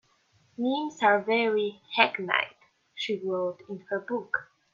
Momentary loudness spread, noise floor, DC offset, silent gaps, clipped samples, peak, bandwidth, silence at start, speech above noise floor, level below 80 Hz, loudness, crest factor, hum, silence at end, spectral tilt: 12 LU; -66 dBFS; under 0.1%; none; under 0.1%; -6 dBFS; 7.4 kHz; 0.6 s; 39 dB; -80 dBFS; -28 LUFS; 22 dB; none; 0.3 s; -4.5 dB/octave